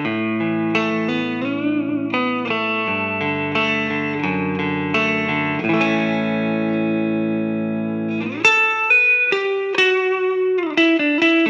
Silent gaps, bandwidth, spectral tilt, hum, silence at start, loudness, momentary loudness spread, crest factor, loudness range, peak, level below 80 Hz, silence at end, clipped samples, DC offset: none; 8.4 kHz; -5.5 dB/octave; none; 0 s; -18 LUFS; 8 LU; 16 dB; 5 LU; -2 dBFS; -68 dBFS; 0 s; under 0.1%; under 0.1%